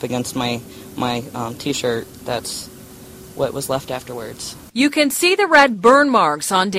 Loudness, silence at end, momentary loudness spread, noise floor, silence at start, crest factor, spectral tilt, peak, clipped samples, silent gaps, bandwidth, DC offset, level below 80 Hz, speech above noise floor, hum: -18 LUFS; 0 s; 18 LU; -39 dBFS; 0 s; 18 dB; -3.5 dB/octave; 0 dBFS; under 0.1%; none; 16 kHz; under 0.1%; -52 dBFS; 21 dB; none